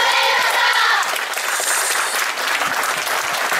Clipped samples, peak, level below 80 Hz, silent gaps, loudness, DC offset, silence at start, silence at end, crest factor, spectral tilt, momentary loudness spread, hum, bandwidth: under 0.1%; -4 dBFS; -68 dBFS; none; -17 LUFS; under 0.1%; 0 s; 0 s; 14 dB; 1.5 dB/octave; 5 LU; none; 16.5 kHz